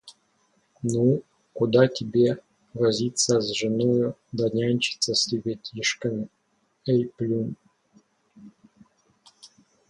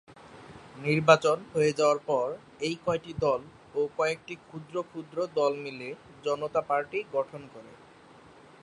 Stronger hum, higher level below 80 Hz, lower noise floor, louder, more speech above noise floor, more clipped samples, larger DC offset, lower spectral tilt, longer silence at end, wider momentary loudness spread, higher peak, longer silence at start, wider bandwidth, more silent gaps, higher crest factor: neither; about the same, -64 dBFS vs -64 dBFS; first, -67 dBFS vs -54 dBFS; first, -24 LUFS vs -29 LUFS; first, 43 dB vs 25 dB; neither; neither; about the same, -4.5 dB/octave vs -5 dB/octave; second, 0.45 s vs 0.9 s; second, 12 LU vs 18 LU; about the same, -6 dBFS vs -4 dBFS; about the same, 0.05 s vs 0.1 s; about the same, 11.5 kHz vs 11 kHz; neither; about the same, 20 dB vs 24 dB